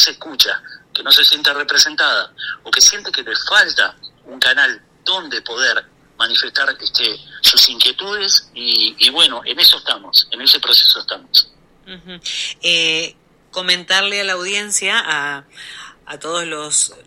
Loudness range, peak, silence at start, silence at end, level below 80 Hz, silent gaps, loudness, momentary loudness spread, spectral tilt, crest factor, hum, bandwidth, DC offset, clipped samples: 6 LU; 0 dBFS; 0 s; 0.15 s; -56 dBFS; none; -13 LUFS; 15 LU; 1 dB/octave; 16 dB; none; over 20 kHz; under 0.1%; under 0.1%